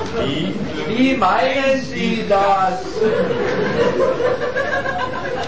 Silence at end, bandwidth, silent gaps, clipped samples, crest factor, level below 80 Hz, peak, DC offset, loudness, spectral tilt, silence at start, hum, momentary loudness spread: 0 s; 8 kHz; none; under 0.1%; 14 dB; -42 dBFS; -4 dBFS; 3%; -18 LUFS; -5.5 dB/octave; 0 s; none; 7 LU